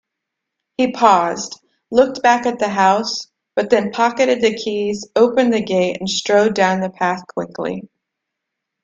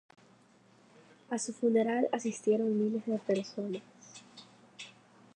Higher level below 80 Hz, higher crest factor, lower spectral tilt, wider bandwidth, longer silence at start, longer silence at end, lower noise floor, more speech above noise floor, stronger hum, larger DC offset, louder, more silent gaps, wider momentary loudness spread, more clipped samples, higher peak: first, -60 dBFS vs -88 dBFS; about the same, 18 dB vs 18 dB; about the same, -4 dB/octave vs -5 dB/octave; second, 9 kHz vs 10.5 kHz; second, 0.8 s vs 1.3 s; first, 0.95 s vs 0.45 s; first, -80 dBFS vs -63 dBFS; first, 63 dB vs 32 dB; neither; neither; first, -17 LUFS vs -32 LUFS; neither; second, 11 LU vs 22 LU; neither; first, 0 dBFS vs -16 dBFS